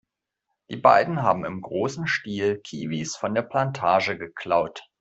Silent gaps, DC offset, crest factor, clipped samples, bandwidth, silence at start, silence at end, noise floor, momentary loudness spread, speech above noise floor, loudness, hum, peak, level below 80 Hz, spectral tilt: none; under 0.1%; 22 dB; under 0.1%; 8.2 kHz; 0.7 s; 0.2 s; -81 dBFS; 12 LU; 57 dB; -24 LUFS; none; -2 dBFS; -64 dBFS; -5 dB/octave